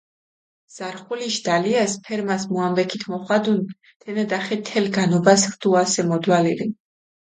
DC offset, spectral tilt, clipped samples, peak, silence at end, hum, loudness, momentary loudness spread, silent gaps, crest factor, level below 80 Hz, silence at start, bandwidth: under 0.1%; -4.5 dB/octave; under 0.1%; -2 dBFS; 0.65 s; none; -21 LUFS; 12 LU; 3.96-4.00 s; 20 dB; -66 dBFS; 0.75 s; 9.6 kHz